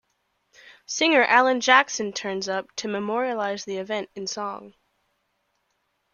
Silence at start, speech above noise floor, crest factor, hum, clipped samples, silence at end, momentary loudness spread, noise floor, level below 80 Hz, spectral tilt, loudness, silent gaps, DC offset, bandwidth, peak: 0.9 s; 50 dB; 24 dB; none; under 0.1%; 1.45 s; 14 LU; -73 dBFS; -72 dBFS; -2.5 dB/octave; -23 LUFS; none; under 0.1%; 7.4 kHz; -2 dBFS